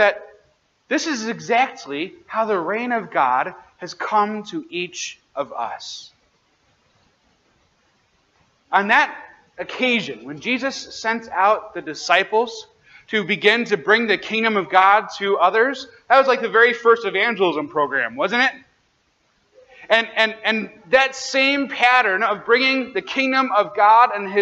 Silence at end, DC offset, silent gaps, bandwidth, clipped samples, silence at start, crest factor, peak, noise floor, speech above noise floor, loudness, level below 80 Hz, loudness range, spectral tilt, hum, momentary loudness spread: 0 s; under 0.1%; none; 8.4 kHz; under 0.1%; 0 s; 20 dB; 0 dBFS; -64 dBFS; 45 dB; -19 LUFS; -68 dBFS; 10 LU; -3 dB/octave; none; 14 LU